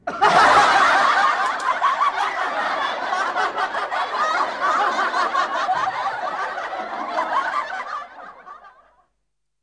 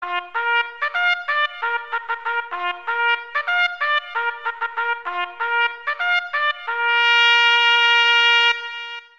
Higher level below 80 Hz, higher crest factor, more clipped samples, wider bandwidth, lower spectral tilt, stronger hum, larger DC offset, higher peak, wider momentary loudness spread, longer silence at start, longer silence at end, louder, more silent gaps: first, -60 dBFS vs -76 dBFS; about the same, 16 dB vs 16 dB; neither; first, 10.5 kHz vs 8 kHz; first, -2 dB/octave vs 2 dB/octave; neither; second, under 0.1% vs 0.3%; about the same, -4 dBFS vs -4 dBFS; about the same, 13 LU vs 12 LU; about the same, 0.05 s vs 0 s; first, 0.95 s vs 0.15 s; about the same, -20 LUFS vs -18 LUFS; neither